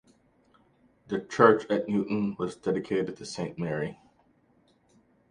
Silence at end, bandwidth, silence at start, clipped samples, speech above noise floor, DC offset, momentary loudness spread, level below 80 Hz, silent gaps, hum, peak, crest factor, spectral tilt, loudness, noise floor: 1.35 s; 10.5 kHz; 1.1 s; under 0.1%; 38 dB; under 0.1%; 14 LU; -66 dBFS; none; none; -6 dBFS; 24 dB; -6.5 dB/octave; -28 LUFS; -65 dBFS